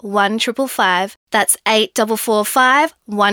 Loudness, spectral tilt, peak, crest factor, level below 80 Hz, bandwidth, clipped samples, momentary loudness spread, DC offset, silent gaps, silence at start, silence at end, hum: -15 LUFS; -2 dB/octave; -2 dBFS; 14 dB; -66 dBFS; over 20 kHz; under 0.1%; 6 LU; under 0.1%; 1.16-1.27 s; 0.05 s; 0 s; none